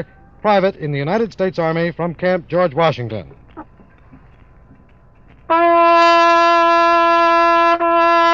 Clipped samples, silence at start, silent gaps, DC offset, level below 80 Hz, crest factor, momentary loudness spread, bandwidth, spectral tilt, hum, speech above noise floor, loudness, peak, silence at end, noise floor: under 0.1%; 0 s; none; 0.2%; -50 dBFS; 14 dB; 11 LU; 7.6 kHz; -6 dB/octave; none; 31 dB; -14 LUFS; -2 dBFS; 0 s; -47 dBFS